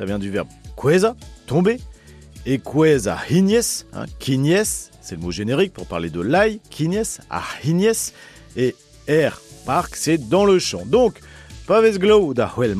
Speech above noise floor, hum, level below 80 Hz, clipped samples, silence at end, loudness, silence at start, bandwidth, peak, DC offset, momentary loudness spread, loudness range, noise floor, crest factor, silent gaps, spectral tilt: 22 dB; none; -44 dBFS; under 0.1%; 0 s; -19 LUFS; 0 s; 14.5 kHz; -4 dBFS; under 0.1%; 12 LU; 4 LU; -41 dBFS; 14 dB; none; -5 dB/octave